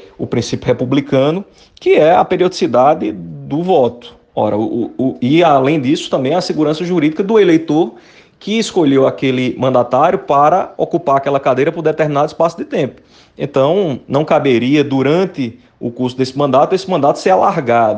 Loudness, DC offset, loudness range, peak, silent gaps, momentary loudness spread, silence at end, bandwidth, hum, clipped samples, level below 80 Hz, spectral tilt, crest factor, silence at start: -14 LUFS; under 0.1%; 2 LU; 0 dBFS; none; 9 LU; 0 s; 9.4 kHz; none; under 0.1%; -54 dBFS; -6.5 dB/octave; 14 dB; 0 s